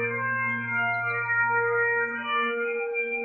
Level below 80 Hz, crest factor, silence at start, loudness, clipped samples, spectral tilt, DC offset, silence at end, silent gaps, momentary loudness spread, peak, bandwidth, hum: -78 dBFS; 12 dB; 0 s; -25 LUFS; under 0.1%; -7.5 dB/octave; under 0.1%; 0 s; none; 4 LU; -14 dBFS; 4.4 kHz; none